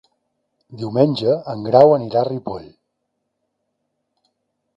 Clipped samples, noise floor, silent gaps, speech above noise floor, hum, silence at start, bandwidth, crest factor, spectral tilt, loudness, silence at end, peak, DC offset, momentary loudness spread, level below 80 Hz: under 0.1%; -75 dBFS; none; 58 dB; none; 0.7 s; 7.6 kHz; 20 dB; -8.5 dB/octave; -17 LUFS; 2.1 s; 0 dBFS; under 0.1%; 19 LU; -60 dBFS